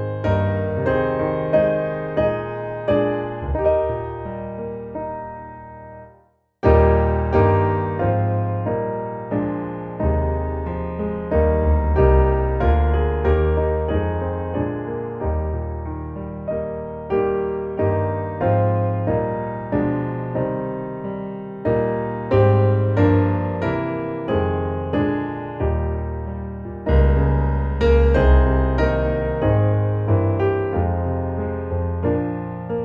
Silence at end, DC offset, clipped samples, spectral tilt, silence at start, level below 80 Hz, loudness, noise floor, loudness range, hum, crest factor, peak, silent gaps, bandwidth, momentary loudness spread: 0 s; under 0.1%; under 0.1%; -10.5 dB/octave; 0 s; -26 dBFS; -21 LUFS; -56 dBFS; 6 LU; none; 16 dB; -4 dBFS; none; 5.2 kHz; 12 LU